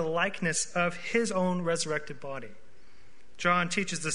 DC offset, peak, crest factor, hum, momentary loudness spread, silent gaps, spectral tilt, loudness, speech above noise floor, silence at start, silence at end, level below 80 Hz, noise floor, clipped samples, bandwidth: 1%; -10 dBFS; 20 dB; none; 13 LU; none; -3.5 dB/octave; -29 LUFS; 30 dB; 0 s; 0 s; -62 dBFS; -60 dBFS; under 0.1%; 11 kHz